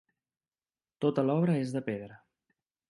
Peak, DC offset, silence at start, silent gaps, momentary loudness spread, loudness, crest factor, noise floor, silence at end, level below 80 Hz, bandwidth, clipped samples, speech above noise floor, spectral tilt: -14 dBFS; under 0.1%; 1 s; none; 12 LU; -31 LUFS; 18 dB; under -90 dBFS; 0.75 s; -76 dBFS; 11.5 kHz; under 0.1%; over 61 dB; -8.5 dB/octave